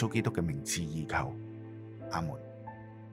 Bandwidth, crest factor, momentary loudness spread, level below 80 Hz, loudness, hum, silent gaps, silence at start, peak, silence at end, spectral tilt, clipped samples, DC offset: 16 kHz; 20 dB; 15 LU; -58 dBFS; -36 LUFS; none; none; 0 s; -16 dBFS; 0 s; -5 dB/octave; under 0.1%; under 0.1%